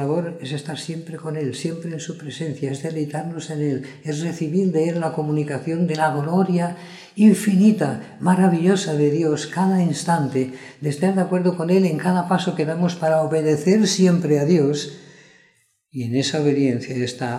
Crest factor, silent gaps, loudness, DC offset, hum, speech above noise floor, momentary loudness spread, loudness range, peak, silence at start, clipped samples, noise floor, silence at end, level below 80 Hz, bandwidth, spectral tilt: 16 dB; none; -21 LUFS; under 0.1%; none; 41 dB; 13 LU; 8 LU; -4 dBFS; 0 s; under 0.1%; -61 dBFS; 0 s; -70 dBFS; 13 kHz; -6.5 dB/octave